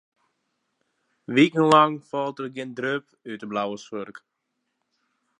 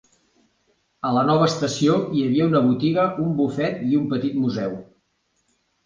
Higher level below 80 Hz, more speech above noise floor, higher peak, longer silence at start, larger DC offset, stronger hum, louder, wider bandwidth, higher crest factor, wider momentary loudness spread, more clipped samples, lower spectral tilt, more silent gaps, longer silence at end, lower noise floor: second, -76 dBFS vs -58 dBFS; first, 55 dB vs 49 dB; about the same, -4 dBFS vs -4 dBFS; first, 1.3 s vs 1.05 s; neither; neither; about the same, -23 LUFS vs -21 LUFS; about the same, 10.5 kHz vs 9.6 kHz; about the same, 22 dB vs 18 dB; first, 19 LU vs 6 LU; neither; about the same, -6 dB/octave vs -6.5 dB/octave; neither; first, 1.2 s vs 1.05 s; first, -78 dBFS vs -69 dBFS